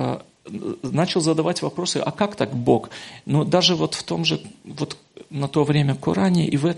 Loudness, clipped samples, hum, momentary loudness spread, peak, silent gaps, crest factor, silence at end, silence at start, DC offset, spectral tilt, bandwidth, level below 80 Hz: -22 LUFS; under 0.1%; none; 14 LU; -2 dBFS; none; 20 dB; 0 s; 0 s; under 0.1%; -5.5 dB/octave; 11.5 kHz; -58 dBFS